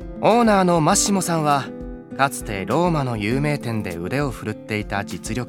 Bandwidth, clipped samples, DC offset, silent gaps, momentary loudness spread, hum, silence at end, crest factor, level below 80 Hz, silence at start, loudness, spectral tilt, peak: 17.5 kHz; under 0.1%; 0.1%; none; 11 LU; none; 0 s; 18 dB; -40 dBFS; 0 s; -20 LUFS; -5 dB/octave; -2 dBFS